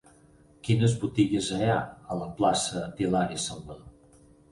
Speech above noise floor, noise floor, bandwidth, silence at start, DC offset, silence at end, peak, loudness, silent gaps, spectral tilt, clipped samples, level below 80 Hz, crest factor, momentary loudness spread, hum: 30 dB; -57 dBFS; 11.5 kHz; 0.65 s; under 0.1%; 0.6 s; -10 dBFS; -27 LUFS; none; -5.5 dB/octave; under 0.1%; -54 dBFS; 18 dB; 13 LU; none